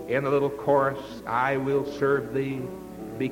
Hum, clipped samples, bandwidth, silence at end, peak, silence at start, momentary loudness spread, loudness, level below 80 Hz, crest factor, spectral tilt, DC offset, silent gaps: none; under 0.1%; 17 kHz; 0 s; -10 dBFS; 0 s; 12 LU; -26 LUFS; -56 dBFS; 16 dB; -7 dB/octave; under 0.1%; none